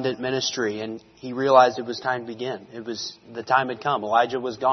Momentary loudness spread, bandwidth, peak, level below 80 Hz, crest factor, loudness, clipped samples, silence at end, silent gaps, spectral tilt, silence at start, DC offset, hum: 17 LU; 6.4 kHz; -2 dBFS; -68 dBFS; 22 dB; -23 LUFS; under 0.1%; 0 s; none; -4 dB/octave; 0 s; under 0.1%; none